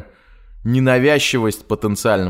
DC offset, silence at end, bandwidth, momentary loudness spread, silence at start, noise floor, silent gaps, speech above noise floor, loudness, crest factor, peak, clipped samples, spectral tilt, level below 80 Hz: under 0.1%; 0 s; 16 kHz; 8 LU; 0.5 s; -45 dBFS; none; 29 dB; -16 LUFS; 16 dB; -2 dBFS; under 0.1%; -5 dB/octave; -44 dBFS